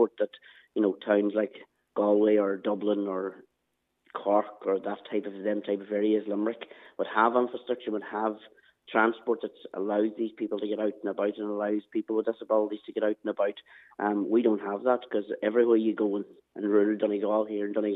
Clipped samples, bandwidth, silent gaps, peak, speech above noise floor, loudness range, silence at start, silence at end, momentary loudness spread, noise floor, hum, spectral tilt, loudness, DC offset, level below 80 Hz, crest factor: under 0.1%; 4 kHz; none; -8 dBFS; 51 dB; 3 LU; 0 s; 0 s; 10 LU; -79 dBFS; none; -9 dB/octave; -29 LUFS; under 0.1%; -88 dBFS; 20 dB